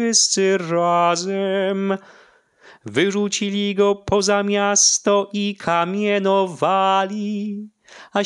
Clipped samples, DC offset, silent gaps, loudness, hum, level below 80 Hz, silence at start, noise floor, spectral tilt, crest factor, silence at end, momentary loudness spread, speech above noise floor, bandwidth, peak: under 0.1%; under 0.1%; none; -19 LUFS; none; -56 dBFS; 0 s; -51 dBFS; -3 dB/octave; 16 dB; 0 s; 11 LU; 32 dB; 11.5 kHz; -4 dBFS